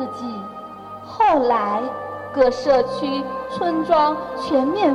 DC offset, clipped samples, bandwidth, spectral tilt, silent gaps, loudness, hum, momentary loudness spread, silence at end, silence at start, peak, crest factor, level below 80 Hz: under 0.1%; under 0.1%; 11 kHz; -6 dB/octave; none; -20 LUFS; none; 16 LU; 0 s; 0 s; -4 dBFS; 16 dB; -52 dBFS